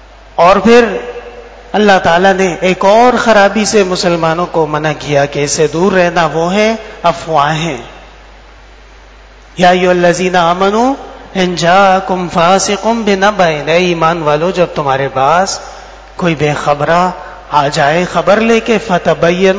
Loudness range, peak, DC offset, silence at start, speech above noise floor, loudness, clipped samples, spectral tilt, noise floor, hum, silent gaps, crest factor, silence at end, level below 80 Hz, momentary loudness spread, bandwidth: 4 LU; 0 dBFS; 0.4%; 0.35 s; 27 dB; -10 LUFS; 0.9%; -4.5 dB/octave; -36 dBFS; none; none; 10 dB; 0 s; -38 dBFS; 9 LU; 8 kHz